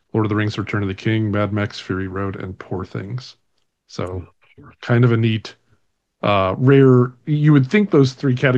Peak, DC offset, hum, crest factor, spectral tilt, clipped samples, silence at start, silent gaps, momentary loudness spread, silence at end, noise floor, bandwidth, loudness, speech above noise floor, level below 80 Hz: -2 dBFS; under 0.1%; none; 16 dB; -8 dB/octave; under 0.1%; 0.15 s; none; 16 LU; 0 s; -67 dBFS; 7.6 kHz; -18 LUFS; 50 dB; -58 dBFS